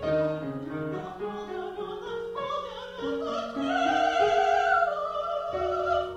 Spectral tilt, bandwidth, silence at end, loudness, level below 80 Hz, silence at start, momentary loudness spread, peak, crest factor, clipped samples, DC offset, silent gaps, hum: -5 dB/octave; 9 kHz; 0 s; -28 LUFS; -56 dBFS; 0 s; 12 LU; -12 dBFS; 16 dB; under 0.1%; under 0.1%; none; none